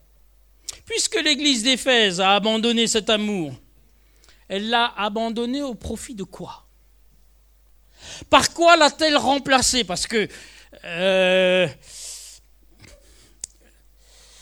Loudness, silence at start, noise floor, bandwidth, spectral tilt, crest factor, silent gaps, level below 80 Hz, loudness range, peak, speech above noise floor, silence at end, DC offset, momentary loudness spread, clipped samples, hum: -19 LUFS; 0.7 s; -55 dBFS; over 20 kHz; -2.5 dB/octave; 22 dB; none; -50 dBFS; 8 LU; 0 dBFS; 35 dB; 2.1 s; under 0.1%; 21 LU; under 0.1%; none